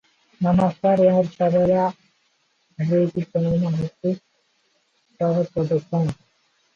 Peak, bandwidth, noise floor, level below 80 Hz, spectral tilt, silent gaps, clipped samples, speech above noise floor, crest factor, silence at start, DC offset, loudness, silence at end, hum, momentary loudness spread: -6 dBFS; 7.2 kHz; -66 dBFS; -52 dBFS; -9.5 dB/octave; none; under 0.1%; 46 dB; 16 dB; 0.4 s; under 0.1%; -21 LUFS; 0.6 s; none; 9 LU